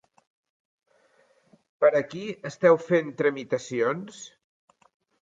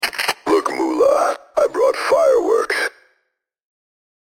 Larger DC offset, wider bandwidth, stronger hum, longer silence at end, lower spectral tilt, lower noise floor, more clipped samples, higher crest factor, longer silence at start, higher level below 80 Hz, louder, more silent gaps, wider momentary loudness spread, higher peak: neither; second, 7.8 kHz vs 17 kHz; neither; second, 0.95 s vs 1.5 s; first, -6 dB/octave vs -2 dB/octave; second, -64 dBFS vs -71 dBFS; neither; first, 20 dB vs 14 dB; first, 1.8 s vs 0 s; second, -78 dBFS vs -58 dBFS; second, -25 LUFS vs -17 LUFS; neither; first, 16 LU vs 6 LU; about the same, -6 dBFS vs -6 dBFS